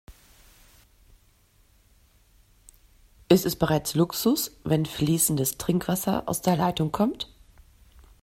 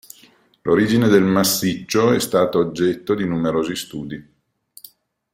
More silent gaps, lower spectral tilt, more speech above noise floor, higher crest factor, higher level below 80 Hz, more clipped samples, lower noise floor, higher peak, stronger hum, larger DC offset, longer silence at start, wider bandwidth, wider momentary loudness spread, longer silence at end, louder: neither; about the same, -5 dB/octave vs -5 dB/octave; about the same, 36 dB vs 35 dB; first, 24 dB vs 18 dB; about the same, -52 dBFS vs -54 dBFS; neither; first, -61 dBFS vs -53 dBFS; about the same, -4 dBFS vs -2 dBFS; neither; neither; second, 0.1 s vs 0.65 s; about the same, 16 kHz vs 16.5 kHz; second, 5 LU vs 15 LU; second, 0.95 s vs 1.15 s; second, -25 LUFS vs -18 LUFS